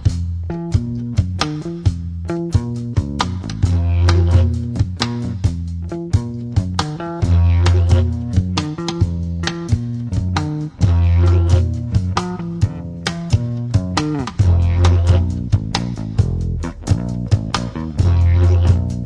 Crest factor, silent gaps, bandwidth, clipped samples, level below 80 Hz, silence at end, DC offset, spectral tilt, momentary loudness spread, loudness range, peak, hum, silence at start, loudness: 16 dB; none; 9.6 kHz; under 0.1%; -26 dBFS; 0 s; under 0.1%; -6.5 dB/octave; 9 LU; 2 LU; -2 dBFS; none; 0 s; -18 LUFS